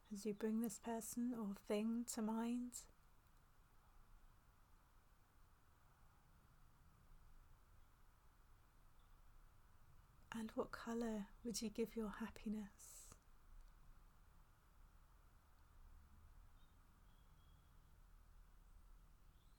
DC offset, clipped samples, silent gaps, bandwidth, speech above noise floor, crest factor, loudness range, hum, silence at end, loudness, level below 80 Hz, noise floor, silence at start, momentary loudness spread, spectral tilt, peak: under 0.1%; under 0.1%; none; 19 kHz; 25 dB; 20 dB; 14 LU; none; 0.05 s; -47 LUFS; -68 dBFS; -71 dBFS; 0.05 s; 13 LU; -4.5 dB/octave; -32 dBFS